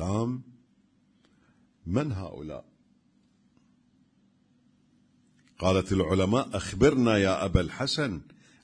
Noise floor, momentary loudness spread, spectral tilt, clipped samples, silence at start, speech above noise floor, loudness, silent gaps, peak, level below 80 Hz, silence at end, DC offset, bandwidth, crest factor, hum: -66 dBFS; 17 LU; -6 dB/octave; under 0.1%; 0 s; 40 dB; -27 LUFS; none; -8 dBFS; -46 dBFS; 0.4 s; under 0.1%; 10.5 kHz; 22 dB; 50 Hz at -65 dBFS